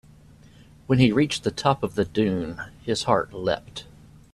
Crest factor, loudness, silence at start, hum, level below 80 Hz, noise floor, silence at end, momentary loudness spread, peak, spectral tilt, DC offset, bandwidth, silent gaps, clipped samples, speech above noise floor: 20 dB; -24 LUFS; 0.9 s; none; -52 dBFS; -50 dBFS; 0.5 s; 14 LU; -4 dBFS; -6 dB/octave; under 0.1%; 12.5 kHz; none; under 0.1%; 27 dB